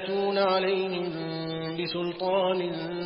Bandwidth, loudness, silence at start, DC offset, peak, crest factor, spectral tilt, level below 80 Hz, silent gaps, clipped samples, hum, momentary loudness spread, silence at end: 5.6 kHz; -28 LUFS; 0 s; under 0.1%; -12 dBFS; 16 dB; -10 dB/octave; -68 dBFS; none; under 0.1%; none; 8 LU; 0 s